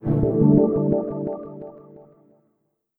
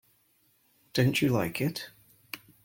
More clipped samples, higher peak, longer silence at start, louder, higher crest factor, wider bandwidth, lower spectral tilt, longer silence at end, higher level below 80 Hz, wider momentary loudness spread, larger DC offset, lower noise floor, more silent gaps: neither; first, -4 dBFS vs -12 dBFS; second, 0 s vs 0.95 s; first, -20 LUFS vs -28 LUFS; about the same, 20 dB vs 20 dB; second, 2.3 kHz vs 17 kHz; first, -14.5 dB/octave vs -5.5 dB/octave; first, 0.95 s vs 0.3 s; first, -44 dBFS vs -62 dBFS; first, 22 LU vs 19 LU; neither; first, -72 dBFS vs -68 dBFS; neither